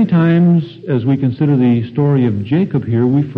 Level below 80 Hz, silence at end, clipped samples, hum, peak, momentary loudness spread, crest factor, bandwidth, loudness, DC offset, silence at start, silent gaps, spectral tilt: -50 dBFS; 0 s; under 0.1%; none; -2 dBFS; 5 LU; 10 dB; 4.7 kHz; -14 LUFS; under 0.1%; 0 s; none; -11 dB/octave